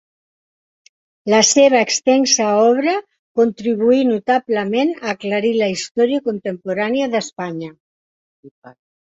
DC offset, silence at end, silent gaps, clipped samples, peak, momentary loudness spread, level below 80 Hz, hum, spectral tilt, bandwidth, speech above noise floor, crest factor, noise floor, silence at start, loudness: under 0.1%; 0.4 s; 3.19-3.35 s, 5.91-5.95 s, 7.80-8.43 s, 8.51-8.62 s; under 0.1%; -2 dBFS; 13 LU; -64 dBFS; none; -3 dB/octave; 8 kHz; over 74 dB; 16 dB; under -90 dBFS; 1.25 s; -16 LUFS